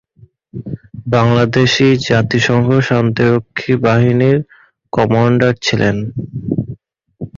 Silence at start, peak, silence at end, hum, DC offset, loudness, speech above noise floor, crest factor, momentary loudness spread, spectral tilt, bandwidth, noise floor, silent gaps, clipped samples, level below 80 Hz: 0.55 s; 0 dBFS; 0.1 s; none; under 0.1%; -13 LUFS; 35 dB; 14 dB; 16 LU; -6.5 dB/octave; 7.4 kHz; -47 dBFS; none; under 0.1%; -44 dBFS